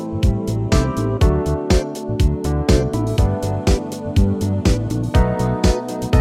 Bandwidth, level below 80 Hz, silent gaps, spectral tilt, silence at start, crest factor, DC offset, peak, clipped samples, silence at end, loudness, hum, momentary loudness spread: 15 kHz; -22 dBFS; none; -6.5 dB/octave; 0 s; 14 dB; under 0.1%; -4 dBFS; under 0.1%; 0 s; -19 LUFS; none; 3 LU